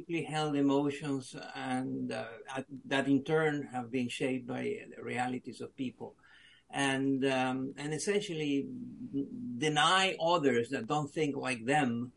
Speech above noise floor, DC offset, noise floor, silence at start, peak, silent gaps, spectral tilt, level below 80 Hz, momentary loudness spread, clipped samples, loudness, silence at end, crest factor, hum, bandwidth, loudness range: 28 dB; under 0.1%; -61 dBFS; 0 s; -14 dBFS; none; -4.5 dB/octave; -74 dBFS; 13 LU; under 0.1%; -33 LUFS; 0.05 s; 20 dB; none; 11.5 kHz; 5 LU